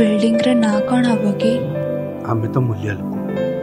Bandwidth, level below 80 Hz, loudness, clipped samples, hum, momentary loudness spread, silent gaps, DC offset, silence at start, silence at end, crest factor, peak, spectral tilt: 14.5 kHz; -54 dBFS; -18 LUFS; under 0.1%; none; 8 LU; none; under 0.1%; 0 s; 0 s; 16 dB; -2 dBFS; -7 dB/octave